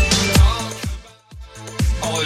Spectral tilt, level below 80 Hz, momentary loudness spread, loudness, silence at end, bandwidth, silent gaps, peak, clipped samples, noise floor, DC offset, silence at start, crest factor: -4 dB/octave; -22 dBFS; 21 LU; -18 LUFS; 0 s; 15.5 kHz; none; -2 dBFS; under 0.1%; -39 dBFS; under 0.1%; 0 s; 18 dB